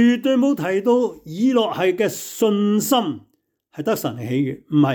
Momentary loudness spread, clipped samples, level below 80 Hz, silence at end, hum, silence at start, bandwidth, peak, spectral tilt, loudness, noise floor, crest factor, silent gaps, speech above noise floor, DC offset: 7 LU; under 0.1%; -66 dBFS; 0 s; none; 0 s; 19.5 kHz; -6 dBFS; -5.5 dB/octave; -20 LUFS; -58 dBFS; 12 dB; none; 39 dB; under 0.1%